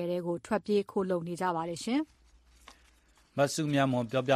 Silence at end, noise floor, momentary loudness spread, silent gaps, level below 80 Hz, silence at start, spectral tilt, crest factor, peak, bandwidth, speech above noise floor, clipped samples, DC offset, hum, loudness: 0 s; -64 dBFS; 6 LU; none; -66 dBFS; 0 s; -5.5 dB/octave; 18 dB; -14 dBFS; 14 kHz; 34 dB; under 0.1%; under 0.1%; none; -31 LUFS